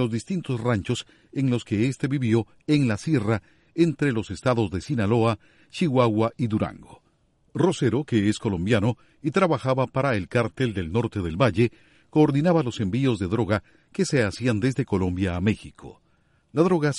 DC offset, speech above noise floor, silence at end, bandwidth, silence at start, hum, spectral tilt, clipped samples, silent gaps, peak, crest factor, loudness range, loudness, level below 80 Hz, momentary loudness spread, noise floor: under 0.1%; 41 dB; 0 s; 11.5 kHz; 0 s; none; -7 dB/octave; under 0.1%; none; -6 dBFS; 18 dB; 2 LU; -24 LUFS; -52 dBFS; 7 LU; -64 dBFS